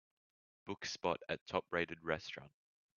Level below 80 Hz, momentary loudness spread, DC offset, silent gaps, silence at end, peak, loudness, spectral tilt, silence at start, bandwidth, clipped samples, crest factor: -74 dBFS; 11 LU; under 0.1%; 1.41-1.46 s; 0.5 s; -18 dBFS; -41 LUFS; -2.5 dB/octave; 0.65 s; 7 kHz; under 0.1%; 24 dB